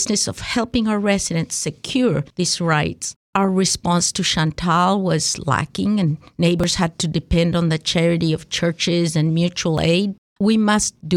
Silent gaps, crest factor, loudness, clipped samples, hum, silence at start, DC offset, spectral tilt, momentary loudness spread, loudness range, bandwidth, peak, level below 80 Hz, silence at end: 3.16-3.33 s, 10.18-10.36 s; 14 dB; -19 LUFS; under 0.1%; none; 0 s; under 0.1%; -4.5 dB/octave; 5 LU; 1 LU; 13.5 kHz; -4 dBFS; -40 dBFS; 0 s